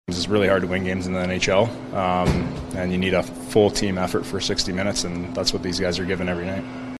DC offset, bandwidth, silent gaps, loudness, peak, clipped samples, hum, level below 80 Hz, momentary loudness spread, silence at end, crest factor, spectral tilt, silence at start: under 0.1%; 13.5 kHz; none; -23 LUFS; -4 dBFS; under 0.1%; none; -40 dBFS; 6 LU; 0 s; 18 dB; -4.5 dB/octave; 0.1 s